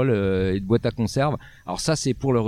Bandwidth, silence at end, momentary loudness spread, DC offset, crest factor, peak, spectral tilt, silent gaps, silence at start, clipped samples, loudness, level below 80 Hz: 15 kHz; 0 s; 6 LU; under 0.1%; 16 dB; -6 dBFS; -6 dB/octave; none; 0 s; under 0.1%; -24 LUFS; -44 dBFS